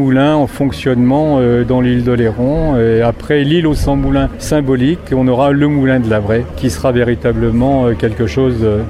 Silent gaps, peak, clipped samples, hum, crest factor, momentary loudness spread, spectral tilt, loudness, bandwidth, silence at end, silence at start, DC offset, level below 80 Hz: none; 0 dBFS; under 0.1%; none; 12 dB; 4 LU; -7.5 dB/octave; -13 LUFS; 13.5 kHz; 0 s; 0 s; under 0.1%; -26 dBFS